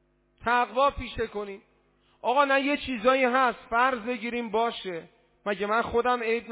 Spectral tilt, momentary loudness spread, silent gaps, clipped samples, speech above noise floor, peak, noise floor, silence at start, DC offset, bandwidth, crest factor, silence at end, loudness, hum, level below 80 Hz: -8 dB/octave; 14 LU; none; under 0.1%; 39 dB; -10 dBFS; -65 dBFS; 0.4 s; under 0.1%; 4 kHz; 18 dB; 0 s; -26 LUFS; 50 Hz at -75 dBFS; -52 dBFS